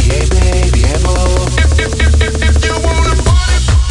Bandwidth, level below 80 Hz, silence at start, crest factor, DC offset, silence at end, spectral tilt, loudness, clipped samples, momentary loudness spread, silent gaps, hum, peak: 11.5 kHz; -12 dBFS; 0 s; 8 dB; under 0.1%; 0 s; -4.5 dB/octave; -12 LUFS; under 0.1%; 1 LU; none; none; 0 dBFS